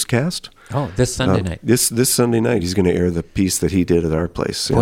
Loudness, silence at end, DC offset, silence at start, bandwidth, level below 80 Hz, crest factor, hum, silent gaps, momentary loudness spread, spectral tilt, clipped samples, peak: -18 LUFS; 0 s; under 0.1%; 0 s; 16.5 kHz; -38 dBFS; 16 dB; none; none; 8 LU; -5 dB/octave; under 0.1%; -2 dBFS